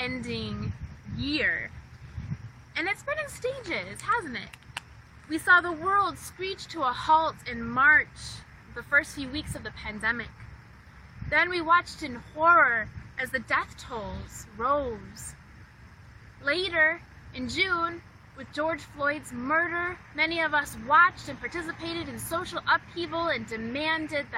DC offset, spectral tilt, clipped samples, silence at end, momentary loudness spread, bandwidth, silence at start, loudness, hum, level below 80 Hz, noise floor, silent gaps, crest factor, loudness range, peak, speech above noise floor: under 0.1%; -4 dB/octave; under 0.1%; 0 s; 19 LU; 16 kHz; 0 s; -27 LUFS; none; -52 dBFS; -50 dBFS; none; 22 dB; 7 LU; -8 dBFS; 23 dB